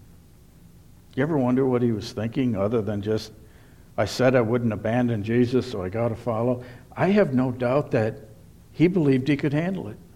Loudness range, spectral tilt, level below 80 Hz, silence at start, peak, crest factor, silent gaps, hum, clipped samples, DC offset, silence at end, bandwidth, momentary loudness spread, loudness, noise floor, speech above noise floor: 2 LU; -7.5 dB/octave; -52 dBFS; 1.15 s; -8 dBFS; 16 dB; none; none; under 0.1%; under 0.1%; 0.1 s; 14 kHz; 9 LU; -24 LUFS; -50 dBFS; 27 dB